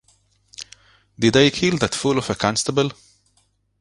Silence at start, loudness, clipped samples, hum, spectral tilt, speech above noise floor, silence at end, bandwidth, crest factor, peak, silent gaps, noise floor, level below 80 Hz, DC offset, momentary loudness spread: 0.6 s; -19 LUFS; under 0.1%; none; -4.5 dB/octave; 45 dB; 0.85 s; 11.5 kHz; 22 dB; 0 dBFS; none; -64 dBFS; -50 dBFS; under 0.1%; 22 LU